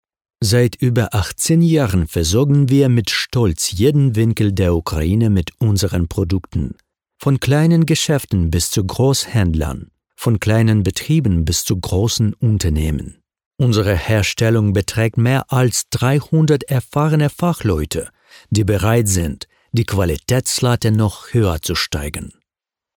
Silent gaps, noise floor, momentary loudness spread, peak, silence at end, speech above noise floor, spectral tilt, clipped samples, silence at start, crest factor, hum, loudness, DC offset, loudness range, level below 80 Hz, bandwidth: 13.46-13.51 s; -88 dBFS; 7 LU; -2 dBFS; 0.65 s; 72 dB; -5.5 dB/octave; under 0.1%; 0.4 s; 14 dB; none; -17 LUFS; under 0.1%; 3 LU; -32 dBFS; 19 kHz